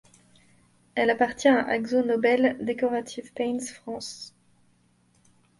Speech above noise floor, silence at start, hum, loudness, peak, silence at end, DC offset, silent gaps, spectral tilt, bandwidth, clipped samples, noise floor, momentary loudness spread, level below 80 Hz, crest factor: 39 dB; 0.95 s; none; -25 LUFS; -8 dBFS; 1.3 s; under 0.1%; none; -4 dB/octave; 11.5 kHz; under 0.1%; -64 dBFS; 15 LU; -66 dBFS; 20 dB